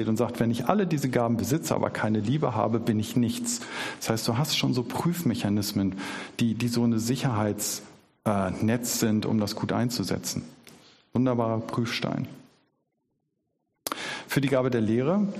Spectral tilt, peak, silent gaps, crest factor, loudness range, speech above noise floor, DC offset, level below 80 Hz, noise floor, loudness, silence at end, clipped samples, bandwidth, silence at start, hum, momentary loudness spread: -5 dB/octave; -4 dBFS; none; 24 dB; 5 LU; 51 dB; under 0.1%; -60 dBFS; -77 dBFS; -27 LUFS; 0 s; under 0.1%; 15 kHz; 0 s; none; 8 LU